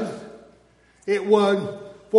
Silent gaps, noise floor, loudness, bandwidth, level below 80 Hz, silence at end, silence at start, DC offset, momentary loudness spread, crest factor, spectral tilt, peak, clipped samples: none; -57 dBFS; -22 LUFS; 11.5 kHz; -66 dBFS; 0 s; 0 s; under 0.1%; 21 LU; 18 dB; -6 dB/octave; -4 dBFS; under 0.1%